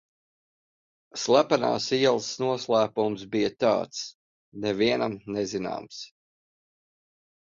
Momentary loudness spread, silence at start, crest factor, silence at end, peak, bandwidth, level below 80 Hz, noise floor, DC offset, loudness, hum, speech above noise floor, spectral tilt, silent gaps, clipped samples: 13 LU; 1.15 s; 22 dB; 1.35 s; -6 dBFS; 7.6 kHz; -66 dBFS; under -90 dBFS; under 0.1%; -26 LUFS; none; over 64 dB; -4.5 dB/octave; 4.15-4.52 s; under 0.1%